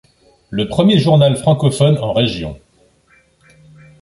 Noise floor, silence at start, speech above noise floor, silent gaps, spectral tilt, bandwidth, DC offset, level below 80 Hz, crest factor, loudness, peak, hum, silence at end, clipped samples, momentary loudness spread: -54 dBFS; 0.5 s; 41 dB; none; -6.5 dB/octave; 11.5 kHz; under 0.1%; -44 dBFS; 14 dB; -14 LUFS; -2 dBFS; none; 1.45 s; under 0.1%; 14 LU